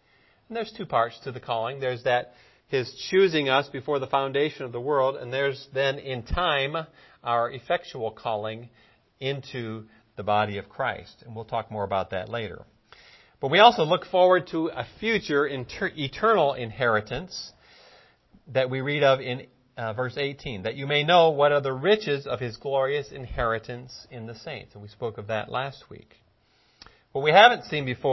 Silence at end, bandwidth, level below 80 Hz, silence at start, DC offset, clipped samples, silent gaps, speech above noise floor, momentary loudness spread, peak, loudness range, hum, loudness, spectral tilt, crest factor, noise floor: 0 s; 6.2 kHz; -50 dBFS; 0.5 s; under 0.1%; under 0.1%; none; 39 dB; 17 LU; 0 dBFS; 8 LU; none; -25 LUFS; -5.5 dB/octave; 26 dB; -64 dBFS